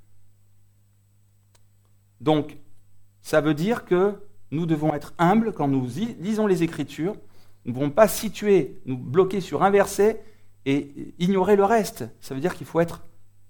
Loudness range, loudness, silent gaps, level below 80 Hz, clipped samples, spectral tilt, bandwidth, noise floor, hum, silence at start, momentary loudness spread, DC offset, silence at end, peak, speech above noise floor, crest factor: 4 LU; -23 LUFS; none; -54 dBFS; under 0.1%; -6 dB/octave; 19 kHz; -59 dBFS; 50 Hz at -50 dBFS; 0.15 s; 14 LU; under 0.1%; 0.2 s; -2 dBFS; 37 dB; 22 dB